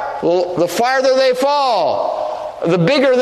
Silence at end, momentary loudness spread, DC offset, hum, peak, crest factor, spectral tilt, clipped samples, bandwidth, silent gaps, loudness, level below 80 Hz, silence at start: 0 s; 8 LU; under 0.1%; none; -2 dBFS; 12 dB; -5 dB/octave; under 0.1%; 13.5 kHz; none; -15 LUFS; -56 dBFS; 0 s